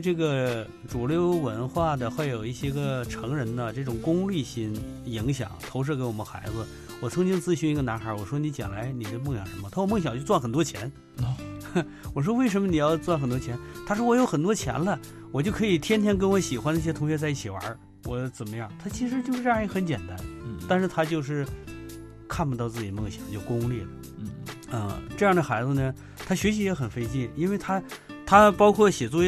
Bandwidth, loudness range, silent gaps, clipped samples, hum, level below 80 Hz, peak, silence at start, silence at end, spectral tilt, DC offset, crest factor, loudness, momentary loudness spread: 14 kHz; 5 LU; none; under 0.1%; none; -48 dBFS; -4 dBFS; 0 s; 0 s; -6 dB/octave; under 0.1%; 22 dB; -27 LUFS; 13 LU